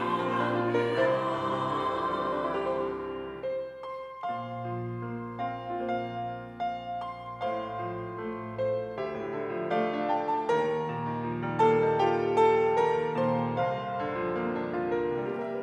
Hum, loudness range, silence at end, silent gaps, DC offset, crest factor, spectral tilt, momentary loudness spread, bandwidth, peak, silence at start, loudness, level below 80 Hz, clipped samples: none; 9 LU; 0 s; none; under 0.1%; 18 dB; -7 dB/octave; 11 LU; 9.6 kHz; -12 dBFS; 0 s; -30 LUFS; -62 dBFS; under 0.1%